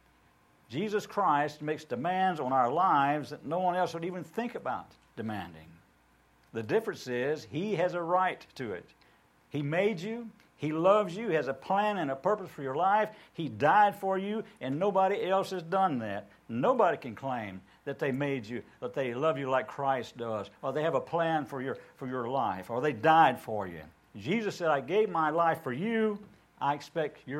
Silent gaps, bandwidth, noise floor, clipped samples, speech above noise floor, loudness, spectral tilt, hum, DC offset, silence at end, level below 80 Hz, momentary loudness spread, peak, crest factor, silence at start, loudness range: none; 16 kHz; -65 dBFS; under 0.1%; 35 dB; -30 LUFS; -6.5 dB/octave; none; under 0.1%; 0 s; -72 dBFS; 14 LU; -10 dBFS; 20 dB; 0.7 s; 4 LU